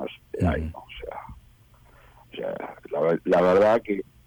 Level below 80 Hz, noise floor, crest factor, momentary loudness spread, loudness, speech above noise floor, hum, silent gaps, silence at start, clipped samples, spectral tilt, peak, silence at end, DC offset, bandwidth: -44 dBFS; -54 dBFS; 14 dB; 19 LU; -24 LUFS; 33 dB; none; none; 0 s; under 0.1%; -7.5 dB/octave; -12 dBFS; 0.25 s; under 0.1%; 19.5 kHz